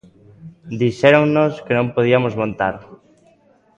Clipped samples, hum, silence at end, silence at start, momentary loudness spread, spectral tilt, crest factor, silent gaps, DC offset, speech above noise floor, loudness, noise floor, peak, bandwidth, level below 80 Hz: under 0.1%; none; 0.8 s; 0.45 s; 10 LU; -7.5 dB/octave; 18 dB; none; under 0.1%; 38 dB; -17 LUFS; -55 dBFS; 0 dBFS; 8.6 kHz; -54 dBFS